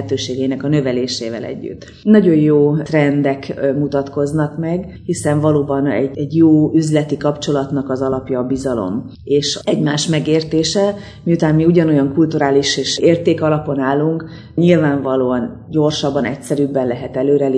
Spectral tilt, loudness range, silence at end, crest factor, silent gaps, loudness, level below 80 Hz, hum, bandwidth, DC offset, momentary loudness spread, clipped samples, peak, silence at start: -6 dB/octave; 3 LU; 0 s; 14 dB; none; -16 LUFS; -46 dBFS; none; 11 kHz; under 0.1%; 9 LU; under 0.1%; 0 dBFS; 0 s